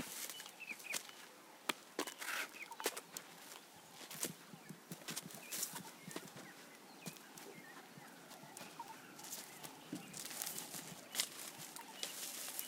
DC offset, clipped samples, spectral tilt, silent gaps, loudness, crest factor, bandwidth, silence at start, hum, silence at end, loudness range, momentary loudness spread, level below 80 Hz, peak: under 0.1%; under 0.1%; -1 dB/octave; none; -47 LUFS; 34 dB; 18 kHz; 0 s; none; 0 s; 7 LU; 13 LU; under -90 dBFS; -16 dBFS